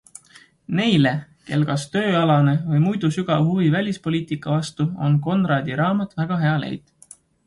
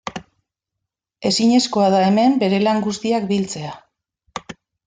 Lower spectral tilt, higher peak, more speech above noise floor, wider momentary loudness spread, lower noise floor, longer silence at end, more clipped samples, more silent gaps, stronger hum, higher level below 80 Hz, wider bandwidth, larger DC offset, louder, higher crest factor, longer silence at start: first, -7 dB/octave vs -5 dB/octave; about the same, -4 dBFS vs -4 dBFS; second, 32 dB vs 65 dB; second, 8 LU vs 18 LU; second, -51 dBFS vs -82 dBFS; first, 0.7 s vs 0.35 s; neither; neither; neither; about the same, -58 dBFS vs -60 dBFS; first, 11.5 kHz vs 9.6 kHz; neither; second, -21 LUFS vs -17 LUFS; about the same, 16 dB vs 14 dB; first, 0.7 s vs 0.05 s